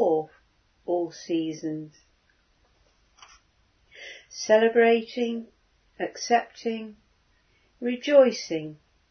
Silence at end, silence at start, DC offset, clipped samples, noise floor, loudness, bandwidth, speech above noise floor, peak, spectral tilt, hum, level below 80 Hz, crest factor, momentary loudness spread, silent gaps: 0.35 s; 0 s; under 0.1%; under 0.1%; -66 dBFS; -25 LUFS; 6.6 kHz; 42 dB; -6 dBFS; -4 dB/octave; none; -70 dBFS; 20 dB; 23 LU; none